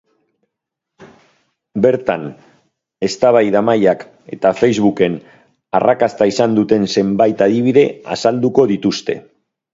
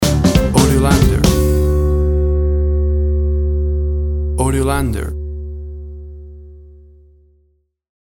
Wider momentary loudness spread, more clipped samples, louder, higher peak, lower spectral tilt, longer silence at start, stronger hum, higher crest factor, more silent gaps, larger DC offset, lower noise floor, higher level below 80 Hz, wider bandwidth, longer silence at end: second, 11 LU vs 17 LU; neither; about the same, -15 LUFS vs -15 LUFS; about the same, 0 dBFS vs 0 dBFS; about the same, -6 dB/octave vs -6 dB/octave; first, 1 s vs 0 s; neither; about the same, 16 dB vs 16 dB; neither; neither; first, -80 dBFS vs -60 dBFS; second, -54 dBFS vs -18 dBFS; second, 7.8 kHz vs 18.5 kHz; second, 0.5 s vs 1.4 s